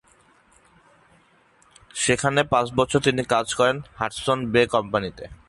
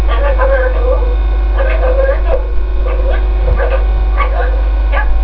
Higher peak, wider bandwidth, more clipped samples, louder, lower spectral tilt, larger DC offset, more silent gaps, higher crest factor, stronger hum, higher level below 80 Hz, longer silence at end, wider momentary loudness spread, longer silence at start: second, -4 dBFS vs 0 dBFS; first, 11.5 kHz vs 4.5 kHz; neither; second, -22 LUFS vs -14 LUFS; second, -4 dB/octave vs -9 dB/octave; second, under 0.1% vs 3%; neither; first, 20 dB vs 10 dB; second, none vs 50 Hz at -10 dBFS; second, -50 dBFS vs -12 dBFS; first, 0.15 s vs 0 s; first, 7 LU vs 3 LU; first, 1.95 s vs 0 s